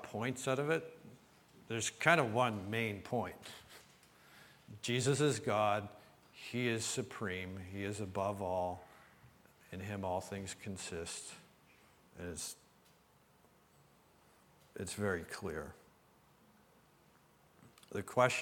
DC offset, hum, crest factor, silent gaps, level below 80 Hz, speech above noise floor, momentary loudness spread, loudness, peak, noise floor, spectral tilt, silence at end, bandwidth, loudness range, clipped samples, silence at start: under 0.1%; none; 28 dB; none; -70 dBFS; 31 dB; 22 LU; -38 LUFS; -12 dBFS; -68 dBFS; -4.5 dB/octave; 0 s; 19 kHz; 11 LU; under 0.1%; 0 s